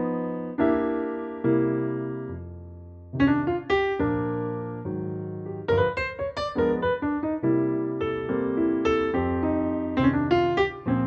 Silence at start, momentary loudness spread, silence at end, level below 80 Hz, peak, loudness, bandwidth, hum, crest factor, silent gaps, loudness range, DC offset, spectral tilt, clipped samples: 0 s; 10 LU; 0 s; -48 dBFS; -10 dBFS; -26 LUFS; 7.2 kHz; none; 16 dB; none; 3 LU; under 0.1%; -8 dB/octave; under 0.1%